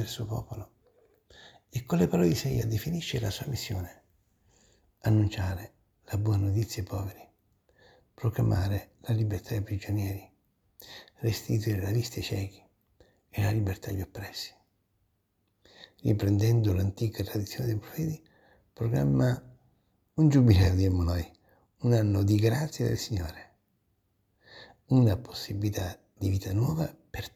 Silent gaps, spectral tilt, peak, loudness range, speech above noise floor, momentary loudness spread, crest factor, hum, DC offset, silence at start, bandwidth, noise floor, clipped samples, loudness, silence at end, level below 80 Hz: none; -7 dB/octave; -8 dBFS; 7 LU; 47 dB; 14 LU; 22 dB; none; under 0.1%; 0 s; 15.5 kHz; -75 dBFS; under 0.1%; -29 LUFS; 0.05 s; -50 dBFS